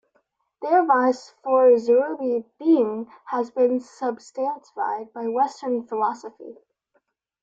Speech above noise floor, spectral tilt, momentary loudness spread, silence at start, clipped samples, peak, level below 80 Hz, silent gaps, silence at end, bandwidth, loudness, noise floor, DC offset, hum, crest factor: 48 dB; -5.5 dB/octave; 13 LU; 0.6 s; under 0.1%; -8 dBFS; -76 dBFS; none; 0.9 s; 7.8 kHz; -22 LUFS; -70 dBFS; under 0.1%; none; 16 dB